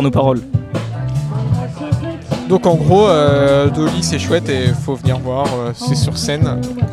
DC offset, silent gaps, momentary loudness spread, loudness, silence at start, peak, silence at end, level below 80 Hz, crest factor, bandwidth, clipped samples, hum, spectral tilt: under 0.1%; none; 9 LU; -15 LUFS; 0 s; 0 dBFS; 0 s; -36 dBFS; 14 dB; 13.5 kHz; under 0.1%; none; -6.5 dB/octave